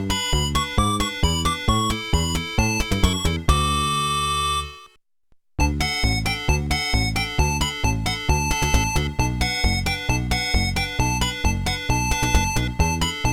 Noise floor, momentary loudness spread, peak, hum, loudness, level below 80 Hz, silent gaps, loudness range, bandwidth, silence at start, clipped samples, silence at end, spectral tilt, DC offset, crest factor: -58 dBFS; 3 LU; -2 dBFS; none; -22 LUFS; -26 dBFS; none; 2 LU; 18 kHz; 0 s; under 0.1%; 0 s; -3.5 dB/octave; under 0.1%; 20 dB